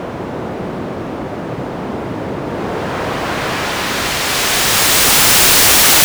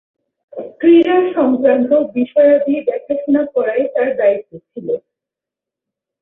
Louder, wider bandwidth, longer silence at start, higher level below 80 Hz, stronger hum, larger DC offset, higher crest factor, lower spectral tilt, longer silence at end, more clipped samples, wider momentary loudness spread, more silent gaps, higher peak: first, -11 LUFS vs -14 LUFS; first, over 20 kHz vs 4 kHz; second, 0 s vs 0.55 s; first, -36 dBFS vs -62 dBFS; neither; neither; about the same, 14 dB vs 14 dB; second, -1.5 dB/octave vs -9 dB/octave; second, 0 s vs 1.25 s; neither; first, 18 LU vs 15 LU; neither; about the same, -2 dBFS vs -2 dBFS